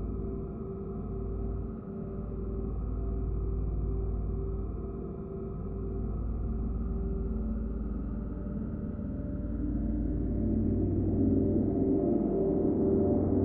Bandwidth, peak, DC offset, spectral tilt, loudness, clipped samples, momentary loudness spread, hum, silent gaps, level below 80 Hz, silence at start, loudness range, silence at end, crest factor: 2.3 kHz; -16 dBFS; under 0.1%; -14 dB/octave; -33 LUFS; under 0.1%; 11 LU; none; none; -36 dBFS; 0 s; 7 LU; 0 s; 14 dB